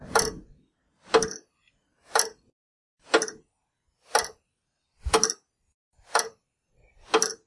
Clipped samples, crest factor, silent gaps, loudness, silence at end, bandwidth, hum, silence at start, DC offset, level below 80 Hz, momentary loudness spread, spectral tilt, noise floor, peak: under 0.1%; 26 dB; 2.53-2.97 s, 5.74-5.91 s; -26 LUFS; 0.1 s; 11.5 kHz; none; 0 s; under 0.1%; -48 dBFS; 15 LU; -1.5 dB/octave; -79 dBFS; -4 dBFS